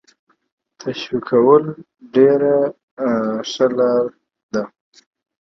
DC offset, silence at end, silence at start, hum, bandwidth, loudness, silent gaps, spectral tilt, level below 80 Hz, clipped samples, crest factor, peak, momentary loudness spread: under 0.1%; 0.75 s; 0.85 s; none; 6.4 kHz; -17 LUFS; 2.83-2.97 s, 4.43-4.49 s; -6 dB/octave; -66 dBFS; under 0.1%; 18 dB; 0 dBFS; 15 LU